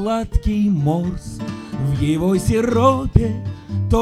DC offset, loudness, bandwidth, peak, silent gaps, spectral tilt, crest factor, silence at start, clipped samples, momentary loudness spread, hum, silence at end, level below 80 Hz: under 0.1%; -19 LUFS; 14 kHz; 0 dBFS; none; -7.5 dB/octave; 18 dB; 0 s; under 0.1%; 13 LU; none; 0 s; -28 dBFS